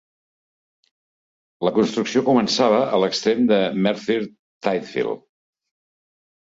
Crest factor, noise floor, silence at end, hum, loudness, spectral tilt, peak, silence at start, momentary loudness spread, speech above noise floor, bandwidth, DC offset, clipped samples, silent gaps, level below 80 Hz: 18 dB; under -90 dBFS; 1.35 s; none; -20 LUFS; -5 dB/octave; -4 dBFS; 1.6 s; 9 LU; over 71 dB; 7.8 kHz; under 0.1%; under 0.1%; 4.39-4.60 s; -64 dBFS